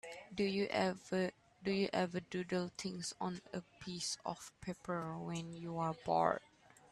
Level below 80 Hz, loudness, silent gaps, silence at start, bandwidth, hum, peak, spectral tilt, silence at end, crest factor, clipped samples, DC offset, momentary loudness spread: -72 dBFS; -40 LUFS; none; 0.05 s; 12.5 kHz; none; -16 dBFS; -5 dB/octave; 0.05 s; 24 dB; under 0.1%; under 0.1%; 12 LU